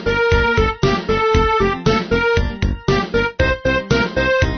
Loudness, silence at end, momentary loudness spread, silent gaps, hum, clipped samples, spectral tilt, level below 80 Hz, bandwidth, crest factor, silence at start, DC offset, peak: -17 LUFS; 0 s; 4 LU; none; none; under 0.1%; -6 dB/octave; -26 dBFS; 6.6 kHz; 14 dB; 0 s; 0.4%; -2 dBFS